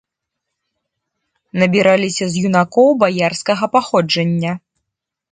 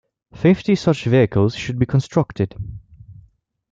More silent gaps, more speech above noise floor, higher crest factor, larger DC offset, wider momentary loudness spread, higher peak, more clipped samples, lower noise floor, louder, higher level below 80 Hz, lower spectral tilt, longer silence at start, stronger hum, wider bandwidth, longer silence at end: neither; first, 65 dB vs 37 dB; about the same, 16 dB vs 18 dB; neither; about the same, 8 LU vs 9 LU; about the same, 0 dBFS vs -2 dBFS; neither; first, -80 dBFS vs -55 dBFS; first, -15 LUFS vs -18 LUFS; second, -60 dBFS vs -46 dBFS; second, -5.5 dB/octave vs -7.5 dB/octave; first, 1.55 s vs 0.35 s; neither; first, 9.4 kHz vs 7.8 kHz; first, 0.75 s vs 0.6 s